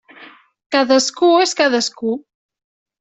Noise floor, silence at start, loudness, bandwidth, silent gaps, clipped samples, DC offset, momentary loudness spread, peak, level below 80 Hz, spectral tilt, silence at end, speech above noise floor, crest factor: -43 dBFS; 0.2 s; -16 LUFS; 8.4 kHz; 0.66-0.70 s; under 0.1%; under 0.1%; 10 LU; -2 dBFS; -66 dBFS; -2 dB/octave; 0.8 s; 28 dB; 16 dB